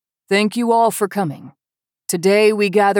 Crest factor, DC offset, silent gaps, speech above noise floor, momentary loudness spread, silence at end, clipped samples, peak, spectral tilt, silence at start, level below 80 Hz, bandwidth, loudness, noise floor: 14 dB; under 0.1%; none; 74 dB; 12 LU; 0 s; under 0.1%; -4 dBFS; -4.5 dB/octave; 0.3 s; -84 dBFS; 18.5 kHz; -17 LUFS; -90 dBFS